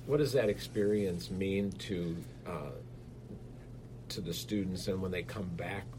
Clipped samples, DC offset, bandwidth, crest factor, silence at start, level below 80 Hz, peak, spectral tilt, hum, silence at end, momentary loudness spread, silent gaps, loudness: under 0.1%; under 0.1%; 16 kHz; 20 dB; 0 s; -56 dBFS; -16 dBFS; -6 dB/octave; none; 0 s; 18 LU; none; -35 LUFS